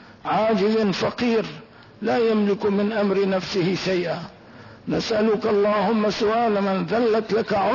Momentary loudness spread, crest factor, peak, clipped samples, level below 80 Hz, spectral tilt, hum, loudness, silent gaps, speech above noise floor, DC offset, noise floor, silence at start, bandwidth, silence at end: 8 LU; 10 dB; -12 dBFS; under 0.1%; -56 dBFS; -6 dB/octave; none; -22 LUFS; none; 23 dB; under 0.1%; -44 dBFS; 0 s; 6 kHz; 0 s